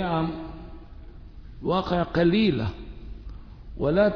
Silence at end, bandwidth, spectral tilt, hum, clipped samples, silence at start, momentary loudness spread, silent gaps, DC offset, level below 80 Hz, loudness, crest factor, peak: 0 s; 5.4 kHz; -8.5 dB/octave; none; under 0.1%; 0 s; 25 LU; none; under 0.1%; -42 dBFS; -25 LUFS; 18 dB; -8 dBFS